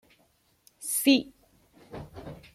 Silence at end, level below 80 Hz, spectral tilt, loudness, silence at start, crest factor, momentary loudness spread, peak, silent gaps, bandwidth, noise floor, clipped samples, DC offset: 0.2 s; -60 dBFS; -2.5 dB/octave; -25 LUFS; 0.8 s; 22 dB; 23 LU; -8 dBFS; none; 16 kHz; -67 dBFS; under 0.1%; under 0.1%